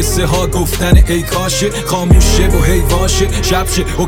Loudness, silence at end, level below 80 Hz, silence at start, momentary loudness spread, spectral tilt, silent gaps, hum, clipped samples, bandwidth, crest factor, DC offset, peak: -12 LUFS; 0 s; -14 dBFS; 0 s; 5 LU; -4.5 dB/octave; none; none; under 0.1%; 17.5 kHz; 10 dB; under 0.1%; 0 dBFS